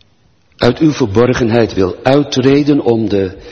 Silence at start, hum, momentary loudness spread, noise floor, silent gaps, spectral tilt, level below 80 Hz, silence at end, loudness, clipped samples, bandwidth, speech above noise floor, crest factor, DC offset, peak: 0.6 s; none; 4 LU; -54 dBFS; none; -6.5 dB/octave; -38 dBFS; 0 s; -12 LUFS; under 0.1%; 8.2 kHz; 42 dB; 12 dB; under 0.1%; 0 dBFS